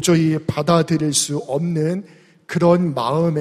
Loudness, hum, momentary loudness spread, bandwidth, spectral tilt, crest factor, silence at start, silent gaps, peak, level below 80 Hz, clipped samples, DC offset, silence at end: -19 LUFS; none; 6 LU; 15 kHz; -5.5 dB/octave; 14 dB; 0 s; none; -4 dBFS; -54 dBFS; under 0.1%; under 0.1%; 0 s